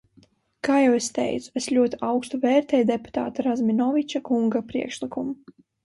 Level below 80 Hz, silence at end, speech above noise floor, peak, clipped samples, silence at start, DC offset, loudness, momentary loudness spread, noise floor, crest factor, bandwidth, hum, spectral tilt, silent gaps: -62 dBFS; 0.5 s; 36 dB; -8 dBFS; under 0.1%; 0.65 s; under 0.1%; -24 LUFS; 10 LU; -59 dBFS; 16 dB; 11.5 kHz; none; -4.5 dB/octave; none